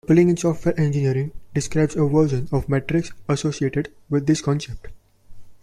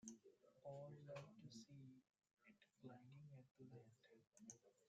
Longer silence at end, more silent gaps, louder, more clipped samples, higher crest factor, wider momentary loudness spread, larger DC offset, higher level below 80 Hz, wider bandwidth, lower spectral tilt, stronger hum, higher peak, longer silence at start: about the same, 0.1 s vs 0 s; second, none vs 2.33-2.37 s, 3.51-3.55 s; first, -22 LUFS vs -63 LUFS; neither; second, 16 dB vs 22 dB; about the same, 8 LU vs 8 LU; neither; first, -42 dBFS vs under -90 dBFS; first, 11.5 kHz vs 8.8 kHz; first, -7 dB/octave vs -5 dB/octave; neither; first, -4 dBFS vs -42 dBFS; about the same, 0.05 s vs 0 s